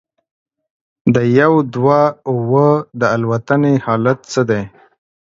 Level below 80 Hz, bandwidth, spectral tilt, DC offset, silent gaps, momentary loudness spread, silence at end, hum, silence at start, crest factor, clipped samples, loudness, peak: -54 dBFS; 7.8 kHz; -7.5 dB/octave; under 0.1%; none; 7 LU; 0.55 s; none; 1.05 s; 16 dB; under 0.1%; -15 LUFS; 0 dBFS